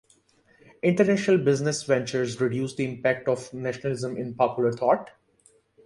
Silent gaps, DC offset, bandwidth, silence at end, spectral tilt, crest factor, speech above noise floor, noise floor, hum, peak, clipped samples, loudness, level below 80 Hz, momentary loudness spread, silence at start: none; under 0.1%; 11.5 kHz; 0.75 s; -6 dB/octave; 18 dB; 37 dB; -62 dBFS; none; -8 dBFS; under 0.1%; -25 LUFS; -64 dBFS; 8 LU; 0.85 s